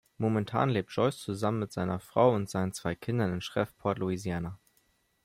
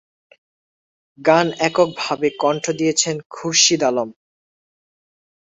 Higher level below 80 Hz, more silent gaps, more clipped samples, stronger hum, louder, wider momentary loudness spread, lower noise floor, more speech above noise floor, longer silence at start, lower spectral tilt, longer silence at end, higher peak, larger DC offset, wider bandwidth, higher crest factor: about the same, -62 dBFS vs -64 dBFS; second, none vs 3.26-3.30 s; neither; neither; second, -31 LUFS vs -18 LUFS; about the same, 8 LU vs 8 LU; second, -71 dBFS vs under -90 dBFS; second, 41 dB vs over 72 dB; second, 0.2 s vs 1.2 s; first, -6.5 dB/octave vs -2.5 dB/octave; second, 0.7 s vs 1.3 s; second, -10 dBFS vs 0 dBFS; neither; first, 16 kHz vs 8.2 kHz; about the same, 20 dB vs 20 dB